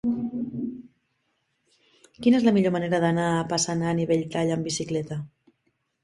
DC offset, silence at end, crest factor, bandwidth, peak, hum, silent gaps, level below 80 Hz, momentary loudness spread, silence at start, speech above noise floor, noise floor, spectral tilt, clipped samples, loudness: under 0.1%; 0.75 s; 18 dB; 11.5 kHz; -8 dBFS; none; none; -62 dBFS; 14 LU; 0.05 s; 50 dB; -74 dBFS; -5.5 dB/octave; under 0.1%; -25 LUFS